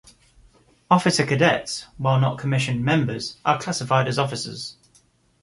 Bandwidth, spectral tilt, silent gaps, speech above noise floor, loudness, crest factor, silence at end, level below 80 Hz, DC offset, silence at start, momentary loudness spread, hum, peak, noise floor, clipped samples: 11.5 kHz; -5 dB/octave; none; 38 dB; -22 LUFS; 20 dB; 0.7 s; -56 dBFS; under 0.1%; 0.9 s; 11 LU; none; -2 dBFS; -60 dBFS; under 0.1%